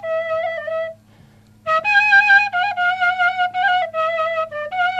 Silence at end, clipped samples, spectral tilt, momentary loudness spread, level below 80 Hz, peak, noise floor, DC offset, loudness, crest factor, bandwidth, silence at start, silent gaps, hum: 0 s; under 0.1%; -2 dB/octave; 13 LU; -64 dBFS; -4 dBFS; -49 dBFS; under 0.1%; -17 LUFS; 14 dB; 9.2 kHz; 0 s; none; none